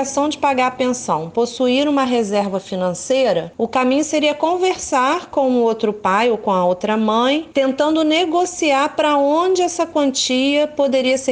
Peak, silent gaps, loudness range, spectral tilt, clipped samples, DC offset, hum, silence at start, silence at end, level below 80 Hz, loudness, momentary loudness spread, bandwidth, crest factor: -4 dBFS; none; 2 LU; -3.5 dB/octave; under 0.1%; under 0.1%; none; 0 s; 0 s; -58 dBFS; -17 LUFS; 4 LU; 10 kHz; 14 dB